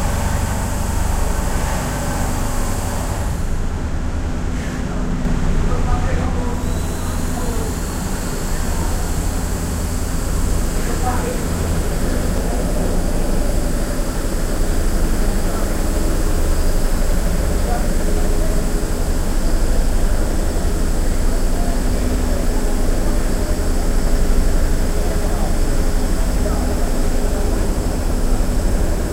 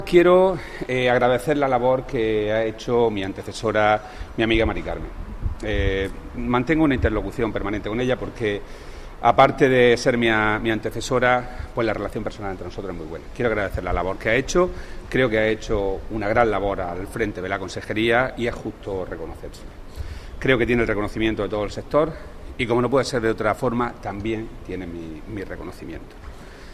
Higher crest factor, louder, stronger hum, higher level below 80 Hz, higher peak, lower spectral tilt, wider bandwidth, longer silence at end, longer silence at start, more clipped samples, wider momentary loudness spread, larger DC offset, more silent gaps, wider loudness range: second, 12 dB vs 20 dB; about the same, -21 LUFS vs -22 LUFS; neither; first, -18 dBFS vs -36 dBFS; about the same, -4 dBFS vs -2 dBFS; about the same, -5.5 dB/octave vs -6 dB/octave; first, 16 kHz vs 14 kHz; about the same, 0 s vs 0 s; about the same, 0 s vs 0 s; neither; second, 3 LU vs 16 LU; neither; neither; second, 2 LU vs 6 LU